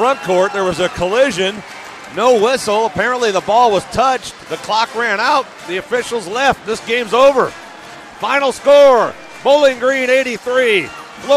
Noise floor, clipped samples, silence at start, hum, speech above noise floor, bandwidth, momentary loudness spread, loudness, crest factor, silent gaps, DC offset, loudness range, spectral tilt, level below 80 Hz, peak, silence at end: -34 dBFS; under 0.1%; 0 s; none; 20 dB; 14 kHz; 15 LU; -14 LUFS; 12 dB; none; under 0.1%; 3 LU; -3.5 dB/octave; -48 dBFS; -2 dBFS; 0 s